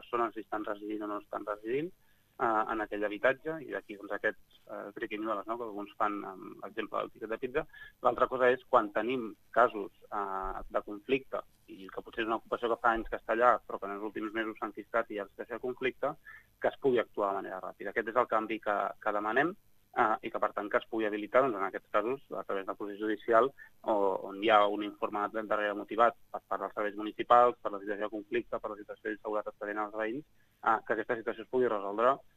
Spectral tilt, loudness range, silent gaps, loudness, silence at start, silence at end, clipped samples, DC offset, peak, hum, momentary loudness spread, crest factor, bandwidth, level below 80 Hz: -6 dB/octave; 5 LU; none; -33 LUFS; 0 s; 0.15 s; under 0.1%; under 0.1%; -8 dBFS; none; 13 LU; 24 dB; 14.5 kHz; -62 dBFS